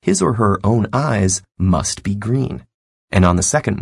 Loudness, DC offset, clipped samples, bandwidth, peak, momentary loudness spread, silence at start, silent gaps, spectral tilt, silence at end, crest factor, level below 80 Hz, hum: -17 LUFS; under 0.1%; under 0.1%; 11.5 kHz; 0 dBFS; 6 LU; 0.05 s; 2.74-3.08 s; -5.5 dB/octave; 0 s; 16 dB; -40 dBFS; none